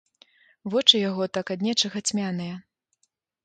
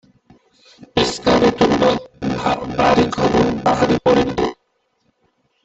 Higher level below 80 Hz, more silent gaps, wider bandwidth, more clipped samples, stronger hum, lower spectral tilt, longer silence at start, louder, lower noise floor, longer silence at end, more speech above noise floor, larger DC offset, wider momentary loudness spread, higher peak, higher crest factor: second, -72 dBFS vs -42 dBFS; neither; first, 9.4 kHz vs 8.2 kHz; neither; neither; second, -3.5 dB/octave vs -5.5 dB/octave; second, 0.65 s vs 0.8 s; second, -23 LUFS vs -17 LUFS; first, -73 dBFS vs -66 dBFS; second, 0.85 s vs 1.1 s; about the same, 49 dB vs 51 dB; neither; first, 18 LU vs 8 LU; about the same, -2 dBFS vs -2 dBFS; first, 26 dB vs 16 dB